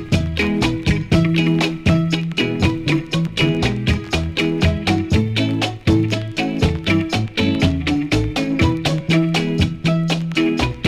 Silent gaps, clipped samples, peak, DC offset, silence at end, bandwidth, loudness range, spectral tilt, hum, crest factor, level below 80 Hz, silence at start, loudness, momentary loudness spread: none; under 0.1%; -6 dBFS; under 0.1%; 0 s; 13 kHz; 1 LU; -6 dB/octave; none; 12 dB; -32 dBFS; 0 s; -18 LUFS; 3 LU